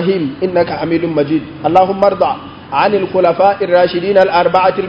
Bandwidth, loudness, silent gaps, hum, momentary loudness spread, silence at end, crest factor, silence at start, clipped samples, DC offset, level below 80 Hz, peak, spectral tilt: 6 kHz; -13 LUFS; none; none; 6 LU; 0 s; 12 dB; 0 s; 0.2%; under 0.1%; -46 dBFS; 0 dBFS; -8 dB/octave